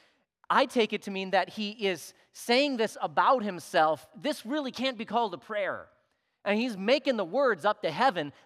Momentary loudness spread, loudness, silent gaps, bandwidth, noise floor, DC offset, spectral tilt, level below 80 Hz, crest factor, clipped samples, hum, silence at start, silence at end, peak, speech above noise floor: 9 LU; -28 LUFS; none; 15.5 kHz; -73 dBFS; under 0.1%; -4 dB/octave; -82 dBFS; 20 dB; under 0.1%; none; 0.5 s; 0.15 s; -8 dBFS; 45 dB